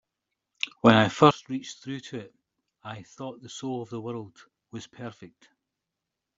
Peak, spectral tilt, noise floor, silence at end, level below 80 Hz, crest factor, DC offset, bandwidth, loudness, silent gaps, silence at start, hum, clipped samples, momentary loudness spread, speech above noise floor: -4 dBFS; -5.5 dB/octave; -86 dBFS; 1.1 s; -66 dBFS; 26 dB; under 0.1%; 7.8 kHz; -25 LUFS; none; 0.65 s; none; under 0.1%; 23 LU; 59 dB